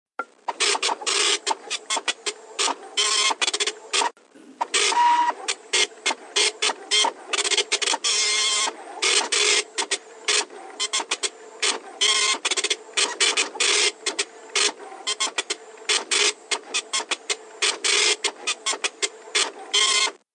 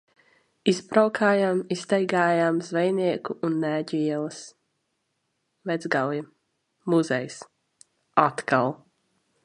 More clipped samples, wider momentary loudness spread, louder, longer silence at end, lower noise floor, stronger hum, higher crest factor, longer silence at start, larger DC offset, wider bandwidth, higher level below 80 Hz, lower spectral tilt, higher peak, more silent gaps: neither; second, 9 LU vs 14 LU; first, -21 LUFS vs -25 LUFS; second, 0.2 s vs 0.7 s; second, -49 dBFS vs -76 dBFS; neither; second, 18 dB vs 24 dB; second, 0.2 s vs 0.65 s; neither; about the same, 10.5 kHz vs 11 kHz; second, under -90 dBFS vs -74 dBFS; second, 3.5 dB/octave vs -5.5 dB/octave; second, -6 dBFS vs -2 dBFS; neither